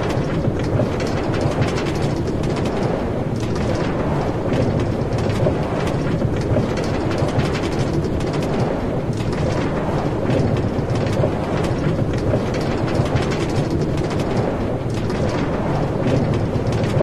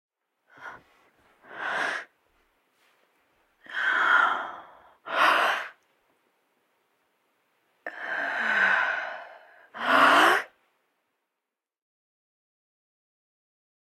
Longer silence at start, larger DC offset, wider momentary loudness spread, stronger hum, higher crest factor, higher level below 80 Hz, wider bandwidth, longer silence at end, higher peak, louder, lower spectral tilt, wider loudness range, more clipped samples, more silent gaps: second, 0 s vs 0.6 s; first, 1% vs under 0.1%; second, 2 LU vs 25 LU; neither; second, 14 dB vs 22 dB; first, -32 dBFS vs -80 dBFS; second, 13 kHz vs 16.5 kHz; second, 0 s vs 3.55 s; about the same, -4 dBFS vs -6 dBFS; first, -21 LUFS vs -24 LUFS; first, -7 dB/octave vs -1.5 dB/octave; second, 1 LU vs 10 LU; neither; neither